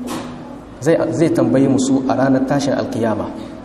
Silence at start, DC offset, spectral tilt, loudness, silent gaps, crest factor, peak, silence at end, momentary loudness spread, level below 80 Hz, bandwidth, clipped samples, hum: 0 s; under 0.1%; -6.5 dB/octave; -16 LUFS; none; 14 dB; -2 dBFS; 0 s; 13 LU; -46 dBFS; 13 kHz; under 0.1%; none